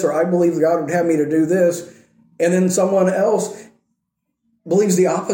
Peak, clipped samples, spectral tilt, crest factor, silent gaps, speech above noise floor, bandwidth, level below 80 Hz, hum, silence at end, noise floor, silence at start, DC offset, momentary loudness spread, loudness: -4 dBFS; under 0.1%; -6 dB/octave; 12 dB; none; 59 dB; 17 kHz; -66 dBFS; none; 0 s; -75 dBFS; 0 s; under 0.1%; 5 LU; -17 LUFS